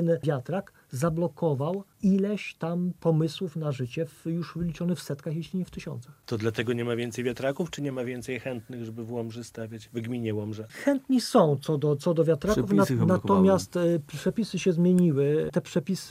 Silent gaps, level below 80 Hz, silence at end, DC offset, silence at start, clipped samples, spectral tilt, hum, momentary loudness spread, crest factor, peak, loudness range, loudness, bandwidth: none; -56 dBFS; 0 s; under 0.1%; 0 s; under 0.1%; -7 dB/octave; none; 13 LU; 18 dB; -8 dBFS; 9 LU; -27 LUFS; 15.5 kHz